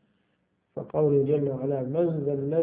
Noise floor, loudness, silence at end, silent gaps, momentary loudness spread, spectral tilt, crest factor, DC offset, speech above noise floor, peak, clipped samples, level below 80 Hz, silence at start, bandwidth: -73 dBFS; -26 LUFS; 0 s; none; 11 LU; -13.5 dB/octave; 14 dB; under 0.1%; 47 dB; -12 dBFS; under 0.1%; -66 dBFS; 0.75 s; 3.7 kHz